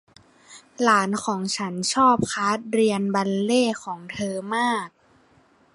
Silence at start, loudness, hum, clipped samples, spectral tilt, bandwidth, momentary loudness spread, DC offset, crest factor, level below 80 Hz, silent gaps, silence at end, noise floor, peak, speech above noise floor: 0.5 s; -23 LUFS; none; under 0.1%; -4 dB/octave; 11.5 kHz; 10 LU; under 0.1%; 20 dB; -62 dBFS; none; 0.85 s; -58 dBFS; -4 dBFS; 36 dB